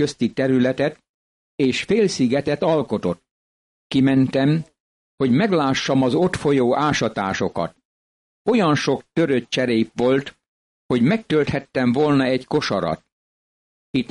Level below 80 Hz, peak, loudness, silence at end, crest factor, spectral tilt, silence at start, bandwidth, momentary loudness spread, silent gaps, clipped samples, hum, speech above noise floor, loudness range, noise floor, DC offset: -54 dBFS; -8 dBFS; -20 LUFS; 0.05 s; 12 dB; -6 dB/octave; 0 s; 11.5 kHz; 7 LU; 1.09-1.58 s, 3.31-3.90 s, 4.80-5.18 s, 7.85-8.45 s, 10.48-10.89 s, 13.12-13.94 s; under 0.1%; none; over 71 dB; 2 LU; under -90 dBFS; under 0.1%